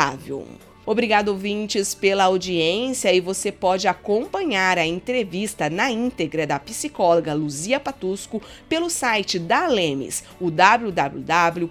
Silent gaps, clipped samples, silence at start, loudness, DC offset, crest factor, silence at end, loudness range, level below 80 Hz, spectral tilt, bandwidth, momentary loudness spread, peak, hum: none; under 0.1%; 0 s; -21 LUFS; under 0.1%; 22 dB; 0 s; 3 LU; -54 dBFS; -3.5 dB/octave; 18 kHz; 9 LU; 0 dBFS; none